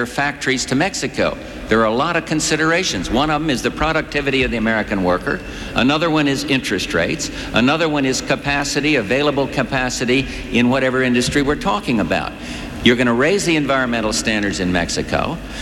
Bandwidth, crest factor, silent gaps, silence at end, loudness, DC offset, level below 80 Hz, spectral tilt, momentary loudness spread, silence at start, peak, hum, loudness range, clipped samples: 17 kHz; 18 dB; none; 0 s; -17 LUFS; under 0.1%; -36 dBFS; -4 dB/octave; 5 LU; 0 s; 0 dBFS; none; 1 LU; under 0.1%